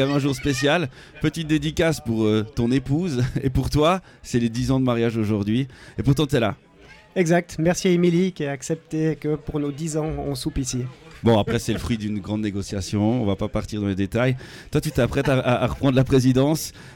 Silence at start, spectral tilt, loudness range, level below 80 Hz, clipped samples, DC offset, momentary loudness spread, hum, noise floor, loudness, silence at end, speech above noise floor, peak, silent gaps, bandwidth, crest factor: 0 s; -6 dB/octave; 3 LU; -40 dBFS; under 0.1%; under 0.1%; 8 LU; none; -48 dBFS; -23 LUFS; 0 s; 26 dB; -8 dBFS; none; 17 kHz; 14 dB